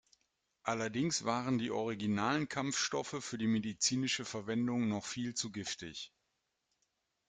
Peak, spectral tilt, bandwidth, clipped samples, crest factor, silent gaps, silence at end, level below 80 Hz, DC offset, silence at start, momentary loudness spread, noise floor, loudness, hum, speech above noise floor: -18 dBFS; -3.5 dB/octave; 9.6 kHz; under 0.1%; 18 dB; none; 1.2 s; -72 dBFS; under 0.1%; 0.65 s; 8 LU; -84 dBFS; -36 LUFS; none; 48 dB